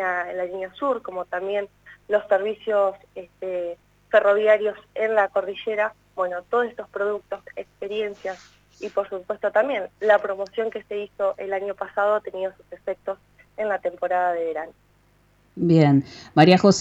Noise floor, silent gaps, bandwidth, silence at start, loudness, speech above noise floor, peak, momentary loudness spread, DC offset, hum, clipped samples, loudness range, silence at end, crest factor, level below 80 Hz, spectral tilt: -60 dBFS; none; 8 kHz; 0 s; -23 LUFS; 37 dB; -2 dBFS; 16 LU; under 0.1%; 50 Hz at -60 dBFS; under 0.1%; 5 LU; 0 s; 20 dB; -64 dBFS; -6 dB/octave